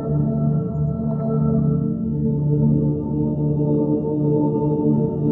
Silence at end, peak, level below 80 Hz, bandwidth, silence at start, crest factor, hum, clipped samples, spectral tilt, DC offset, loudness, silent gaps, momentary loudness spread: 0 s; -8 dBFS; -40 dBFS; 1.5 kHz; 0 s; 12 dB; none; under 0.1%; -15 dB/octave; under 0.1%; -20 LUFS; none; 4 LU